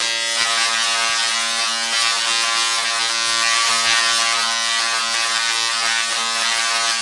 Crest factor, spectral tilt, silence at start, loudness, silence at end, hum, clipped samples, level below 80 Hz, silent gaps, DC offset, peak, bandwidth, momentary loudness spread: 18 dB; 2.5 dB/octave; 0 s; -16 LUFS; 0 s; none; under 0.1%; -66 dBFS; none; under 0.1%; 0 dBFS; 11.5 kHz; 3 LU